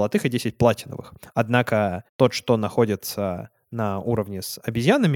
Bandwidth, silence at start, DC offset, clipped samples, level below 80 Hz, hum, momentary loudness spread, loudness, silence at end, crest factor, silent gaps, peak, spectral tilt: 18 kHz; 0 s; under 0.1%; under 0.1%; -54 dBFS; none; 10 LU; -23 LUFS; 0 s; 20 dB; 2.09-2.19 s; -2 dBFS; -6 dB/octave